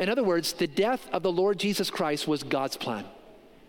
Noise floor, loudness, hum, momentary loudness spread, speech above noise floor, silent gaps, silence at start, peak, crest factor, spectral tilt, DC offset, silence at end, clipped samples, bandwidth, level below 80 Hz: -52 dBFS; -28 LUFS; none; 7 LU; 25 dB; none; 0 s; -10 dBFS; 18 dB; -4.5 dB/octave; under 0.1%; 0.3 s; under 0.1%; 17 kHz; -64 dBFS